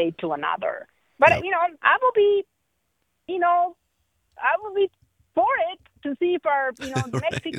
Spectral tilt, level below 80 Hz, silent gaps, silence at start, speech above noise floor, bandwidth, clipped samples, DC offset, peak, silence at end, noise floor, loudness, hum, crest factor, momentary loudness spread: -5.5 dB/octave; -62 dBFS; none; 0 s; 52 dB; 11 kHz; under 0.1%; under 0.1%; -2 dBFS; 0 s; -74 dBFS; -23 LUFS; none; 20 dB; 11 LU